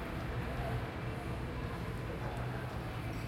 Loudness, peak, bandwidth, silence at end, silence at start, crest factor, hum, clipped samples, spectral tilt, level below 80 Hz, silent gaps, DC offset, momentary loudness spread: -40 LUFS; -26 dBFS; 16.5 kHz; 0 s; 0 s; 14 dB; none; under 0.1%; -7 dB/octave; -46 dBFS; none; under 0.1%; 2 LU